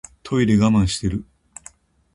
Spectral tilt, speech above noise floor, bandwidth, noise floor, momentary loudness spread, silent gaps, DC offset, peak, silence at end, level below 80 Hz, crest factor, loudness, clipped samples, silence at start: -6 dB/octave; 30 dB; 11.5 kHz; -48 dBFS; 24 LU; none; under 0.1%; -4 dBFS; 0.95 s; -38 dBFS; 18 dB; -19 LUFS; under 0.1%; 0.25 s